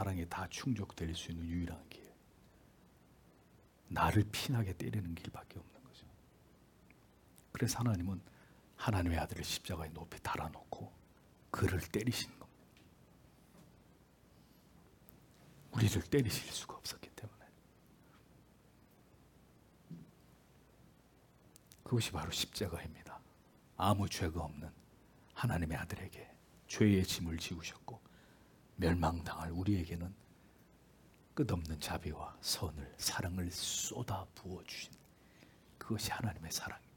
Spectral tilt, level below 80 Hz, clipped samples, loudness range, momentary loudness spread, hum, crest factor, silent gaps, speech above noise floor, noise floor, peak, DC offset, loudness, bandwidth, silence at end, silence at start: -5 dB/octave; -60 dBFS; under 0.1%; 7 LU; 20 LU; none; 24 dB; none; 28 dB; -66 dBFS; -16 dBFS; under 0.1%; -39 LUFS; 18 kHz; 0.2 s; 0 s